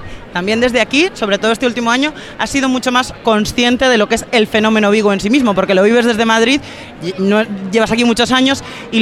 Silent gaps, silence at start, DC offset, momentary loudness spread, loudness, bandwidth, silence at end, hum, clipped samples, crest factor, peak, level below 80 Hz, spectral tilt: none; 0 s; under 0.1%; 7 LU; -13 LUFS; 14 kHz; 0 s; none; under 0.1%; 14 dB; 0 dBFS; -40 dBFS; -4 dB/octave